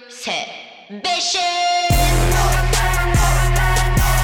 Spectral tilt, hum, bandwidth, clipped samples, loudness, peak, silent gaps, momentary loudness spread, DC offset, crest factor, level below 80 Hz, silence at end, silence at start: -3.5 dB/octave; none; 19 kHz; under 0.1%; -17 LUFS; -6 dBFS; none; 9 LU; under 0.1%; 12 dB; -20 dBFS; 0 s; 0.1 s